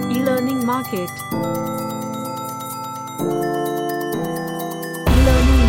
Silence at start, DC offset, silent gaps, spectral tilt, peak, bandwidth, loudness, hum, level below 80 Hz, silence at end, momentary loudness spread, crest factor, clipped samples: 0 s; under 0.1%; none; -6 dB/octave; -2 dBFS; 17 kHz; -21 LUFS; none; -24 dBFS; 0 s; 12 LU; 18 dB; under 0.1%